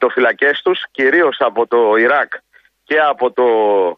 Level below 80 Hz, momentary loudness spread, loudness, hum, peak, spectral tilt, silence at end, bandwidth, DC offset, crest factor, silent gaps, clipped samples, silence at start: -66 dBFS; 6 LU; -14 LUFS; none; -2 dBFS; -6 dB/octave; 0.05 s; 5.4 kHz; under 0.1%; 12 dB; none; under 0.1%; 0 s